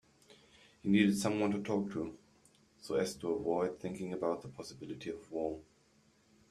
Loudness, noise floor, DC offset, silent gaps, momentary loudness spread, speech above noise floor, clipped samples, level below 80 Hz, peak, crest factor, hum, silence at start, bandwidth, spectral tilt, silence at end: -36 LUFS; -69 dBFS; under 0.1%; none; 16 LU; 34 dB; under 0.1%; -70 dBFS; -14 dBFS; 22 dB; none; 0.3 s; 14 kHz; -6 dB/octave; 0.9 s